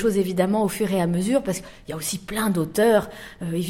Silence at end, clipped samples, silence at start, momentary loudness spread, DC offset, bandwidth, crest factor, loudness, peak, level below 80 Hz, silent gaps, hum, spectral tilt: 0 s; under 0.1%; 0 s; 12 LU; under 0.1%; 16.5 kHz; 16 dB; -23 LUFS; -6 dBFS; -50 dBFS; none; none; -5.5 dB/octave